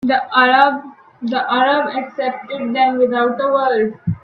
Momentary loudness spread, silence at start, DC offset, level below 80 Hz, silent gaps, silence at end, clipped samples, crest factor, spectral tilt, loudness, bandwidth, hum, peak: 10 LU; 0 s; under 0.1%; -54 dBFS; none; 0.05 s; under 0.1%; 16 dB; -7.5 dB/octave; -16 LUFS; 5.4 kHz; none; 0 dBFS